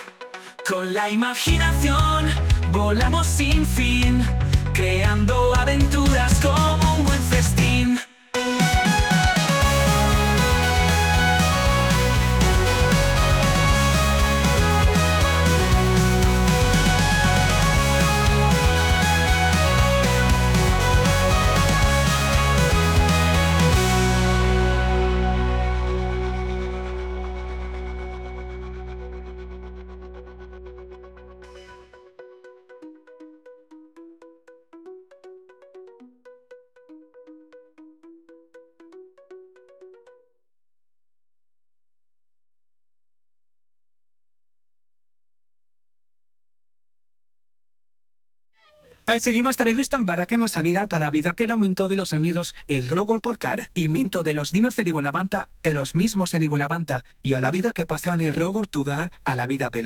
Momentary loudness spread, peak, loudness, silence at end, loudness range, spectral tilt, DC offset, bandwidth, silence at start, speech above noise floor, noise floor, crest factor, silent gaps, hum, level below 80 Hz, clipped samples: 12 LU; -6 dBFS; -20 LUFS; 0 s; 10 LU; -5 dB/octave; under 0.1%; 19 kHz; 0 s; over 69 dB; under -90 dBFS; 14 dB; none; none; -28 dBFS; under 0.1%